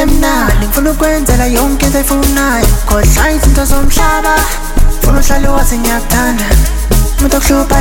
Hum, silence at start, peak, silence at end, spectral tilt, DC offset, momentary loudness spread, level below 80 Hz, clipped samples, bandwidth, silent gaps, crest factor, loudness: none; 0 s; 0 dBFS; 0 s; -4.5 dB/octave; under 0.1%; 3 LU; -10 dBFS; under 0.1%; 17.5 kHz; none; 8 dB; -11 LUFS